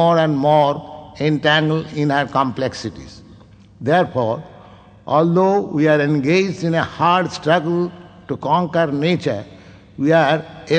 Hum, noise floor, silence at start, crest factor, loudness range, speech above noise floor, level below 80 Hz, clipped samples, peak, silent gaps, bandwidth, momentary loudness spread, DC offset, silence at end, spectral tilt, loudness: none; -44 dBFS; 0 s; 16 dB; 4 LU; 27 dB; -54 dBFS; under 0.1%; -2 dBFS; none; 9 kHz; 12 LU; under 0.1%; 0 s; -6.5 dB/octave; -18 LUFS